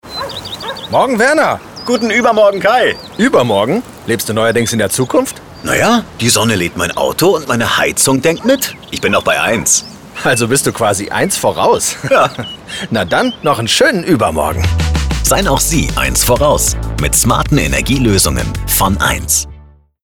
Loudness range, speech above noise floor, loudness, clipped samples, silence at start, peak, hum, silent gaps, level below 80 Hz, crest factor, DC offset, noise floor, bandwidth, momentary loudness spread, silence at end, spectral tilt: 2 LU; 27 dB; -12 LUFS; under 0.1%; 0.05 s; 0 dBFS; none; none; -26 dBFS; 12 dB; 0.2%; -40 dBFS; 19.5 kHz; 8 LU; 0.4 s; -3.5 dB/octave